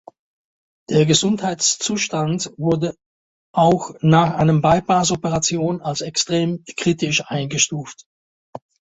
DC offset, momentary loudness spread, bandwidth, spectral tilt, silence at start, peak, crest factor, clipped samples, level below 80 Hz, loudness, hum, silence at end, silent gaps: under 0.1%; 8 LU; 8.2 kHz; -4.5 dB/octave; 0.9 s; -2 dBFS; 16 dB; under 0.1%; -52 dBFS; -19 LUFS; none; 0.4 s; 3.06-3.54 s, 8.06-8.53 s